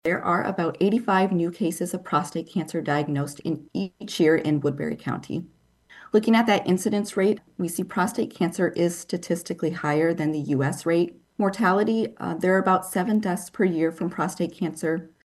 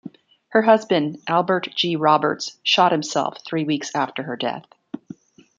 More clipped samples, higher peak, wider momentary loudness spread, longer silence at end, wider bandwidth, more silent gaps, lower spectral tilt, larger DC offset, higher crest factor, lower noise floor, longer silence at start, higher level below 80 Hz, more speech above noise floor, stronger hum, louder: neither; second, -8 dBFS vs -2 dBFS; second, 9 LU vs 13 LU; second, 0.2 s vs 0.6 s; first, 12.5 kHz vs 9.2 kHz; neither; first, -6 dB/octave vs -4.5 dB/octave; neither; about the same, 16 dB vs 20 dB; first, -52 dBFS vs -43 dBFS; about the same, 0.05 s vs 0.05 s; about the same, -66 dBFS vs -70 dBFS; first, 28 dB vs 22 dB; neither; second, -25 LUFS vs -20 LUFS